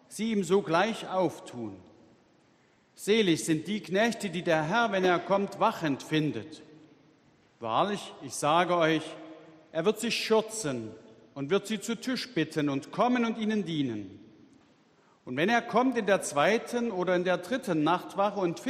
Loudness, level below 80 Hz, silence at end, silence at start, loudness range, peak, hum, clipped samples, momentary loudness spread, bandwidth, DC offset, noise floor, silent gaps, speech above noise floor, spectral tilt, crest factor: -28 LUFS; -72 dBFS; 0 s; 0.1 s; 4 LU; -10 dBFS; none; under 0.1%; 14 LU; 14 kHz; under 0.1%; -64 dBFS; none; 36 dB; -4.5 dB/octave; 20 dB